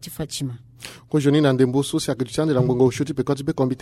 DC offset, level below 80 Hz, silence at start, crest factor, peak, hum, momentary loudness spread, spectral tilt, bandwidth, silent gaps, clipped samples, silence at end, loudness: under 0.1%; -52 dBFS; 0 s; 16 dB; -6 dBFS; none; 13 LU; -6.5 dB/octave; 15 kHz; none; under 0.1%; 0.05 s; -21 LUFS